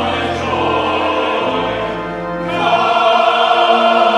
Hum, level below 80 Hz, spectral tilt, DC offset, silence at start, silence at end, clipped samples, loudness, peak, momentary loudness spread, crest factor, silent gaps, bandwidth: none; -44 dBFS; -5 dB/octave; under 0.1%; 0 s; 0 s; under 0.1%; -14 LUFS; 0 dBFS; 9 LU; 14 dB; none; 10.5 kHz